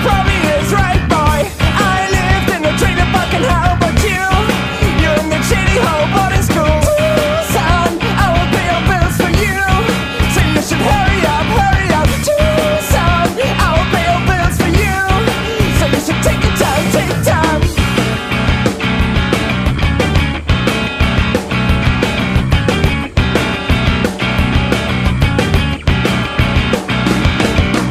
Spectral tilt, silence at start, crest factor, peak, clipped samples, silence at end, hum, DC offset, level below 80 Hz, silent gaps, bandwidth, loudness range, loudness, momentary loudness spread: -5 dB/octave; 0 s; 12 dB; 0 dBFS; under 0.1%; 0 s; none; under 0.1%; -20 dBFS; none; 15.5 kHz; 1 LU; -13 LUFS; 3 LU